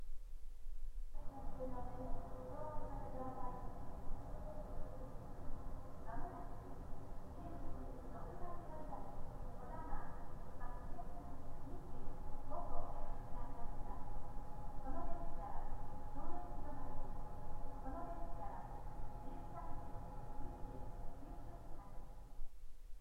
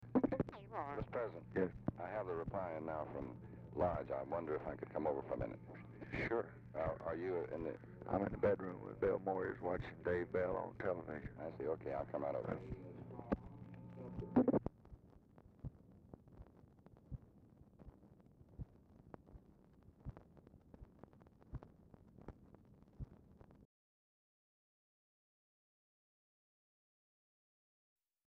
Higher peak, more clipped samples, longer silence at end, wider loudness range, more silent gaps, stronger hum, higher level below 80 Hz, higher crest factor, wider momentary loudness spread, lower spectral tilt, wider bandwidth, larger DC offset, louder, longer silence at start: about the same, -24 dBFS vs -22 dBFS; neither; second, 0 s vs 4.65 s; second, 2 LU vs 19 LU; neither; neither; first, -46 dBFS vs -62 dBFS; second, 16 dB vs 24 dB; second, 6 LU vs 24 LU; about the same, -8 dB/octave vs -7.5 dB/octave; second, 2.1 kHz vs 6.4 kHz; neither; second, -52 LUFS vs -43 LUFS; about the same, 0 s vs 0 s